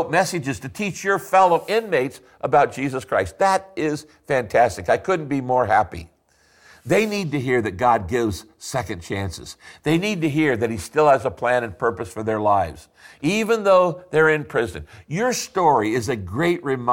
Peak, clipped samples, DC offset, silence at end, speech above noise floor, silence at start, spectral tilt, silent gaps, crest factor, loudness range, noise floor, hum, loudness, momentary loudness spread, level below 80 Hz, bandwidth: -6 dBFS; under 0.1%; under 0.1%; 0 s; 38 dB; 0 s; -5 dB/octave; none; 16 dB; 3 LU; -59 dBFS; none; -21 LUFS; 11 LU; -50 dBFS; 17 kHz